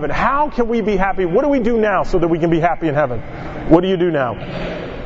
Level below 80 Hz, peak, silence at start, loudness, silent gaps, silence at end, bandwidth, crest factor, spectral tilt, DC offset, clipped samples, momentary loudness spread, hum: -30 dBFS; 0 dBFS; 0 s; -17 LUFS; none; 0 s; 7.6 kHz; 16 dB; -8 dB/octave; under 0.1%; under 0.1%; 11 LU; none